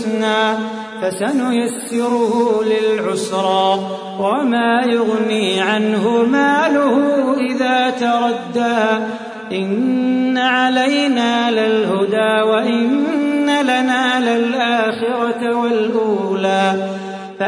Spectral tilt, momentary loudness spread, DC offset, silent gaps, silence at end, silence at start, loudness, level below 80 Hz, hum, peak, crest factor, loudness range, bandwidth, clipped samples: -4.5 dB/octave; 6 LU; under 0.1%; none; 0 s; 0 s; -16 LUFS; -68 dBFS; none; -2 dBFS; 14 dB; 2 LU; 11 kHz; under 0.1%